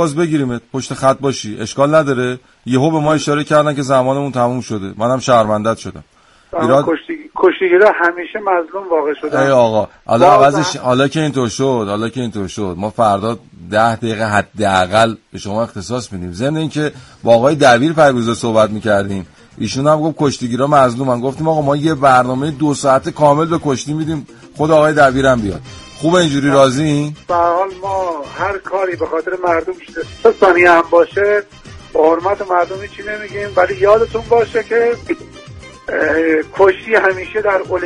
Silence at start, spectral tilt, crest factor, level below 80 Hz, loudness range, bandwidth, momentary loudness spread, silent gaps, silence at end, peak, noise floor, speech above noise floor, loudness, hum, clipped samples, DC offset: 0 s; -5.5 dB/octave; 14 dB; -44 dBFS; 3 LU; 11.5 kHz; 12 LU; none; 0 s; 0 dBFS; -35 dBFS; 21 dB; -14 LUFS; none; under 0.1%; under 0.1%